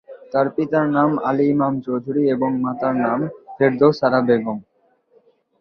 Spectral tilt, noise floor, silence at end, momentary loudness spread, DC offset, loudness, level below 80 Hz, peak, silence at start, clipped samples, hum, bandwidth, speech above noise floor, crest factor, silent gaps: -9 dB/octave; -58 dBFS; 1 s; 9 LU; under 0.1%; -19 LUFS; -60 dBFS; -2 dBFS; 0.1 s; under 0.1%; none; 6.2 kHz; 40 dB; 18 dB; none